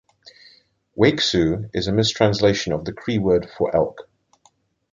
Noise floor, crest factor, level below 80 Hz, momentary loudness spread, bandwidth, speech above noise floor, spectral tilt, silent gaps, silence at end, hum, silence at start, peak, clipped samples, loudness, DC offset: -61 dBFS; 20 dB; -46 dBFS; 8 LU; 9.4 kHz; 41 dB; -5.5 dB/octave; none; 0.9 s; none; 0.95 s; 0 dBFS; under 0.1%; -20 LUFS; under 0.1%